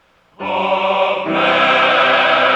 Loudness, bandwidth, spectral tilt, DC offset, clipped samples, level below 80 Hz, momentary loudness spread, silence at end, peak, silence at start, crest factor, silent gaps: -14 LUFS; 8.8 kHz; -4.5 dB/octave; under 0.1%; under 0.1%; -60 dBFS; 8 LU; 0 s; -2 dBFS; 0.4 s; 14 dB; none